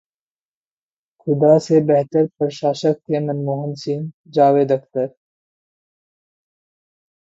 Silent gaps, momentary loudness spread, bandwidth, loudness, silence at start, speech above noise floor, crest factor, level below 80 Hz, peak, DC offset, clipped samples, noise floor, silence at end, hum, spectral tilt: 4.14-4.24 s; 11 LU; 8 kHz; -18 LUFS; 1.25 s; over 73 dB; 20 dB; -68 dBFS; 0 dBFS; under 0.1%; under 0.1%; under -90 dBFS; 2.3 s; none; -7.5 dB/octave